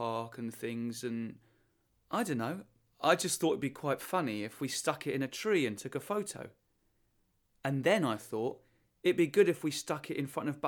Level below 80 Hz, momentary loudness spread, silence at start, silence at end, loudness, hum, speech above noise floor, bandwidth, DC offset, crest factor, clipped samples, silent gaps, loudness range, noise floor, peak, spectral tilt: -76 dBFS; 11 LU; 0 s; 0 s; -34 LUFS; none; 42 dB; 19.5 kHz; under 0.1%; 20 dB; under 0.1%; none; 4 LU; -75 dBFS; -14 dBFS; -4.5 dB/octave